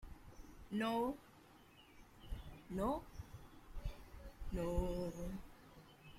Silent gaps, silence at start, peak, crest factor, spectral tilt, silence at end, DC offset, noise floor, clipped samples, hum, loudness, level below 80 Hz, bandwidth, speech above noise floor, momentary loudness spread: none; 0 s; -26 dBFS; 18 dB; -6.5 dB/octave; 0 s; under 0.1%; -64 dBFS; under 0.1%; none; -44 LUFS; -52 dBFS; 16.5 kHz; 24 dB; 23 LU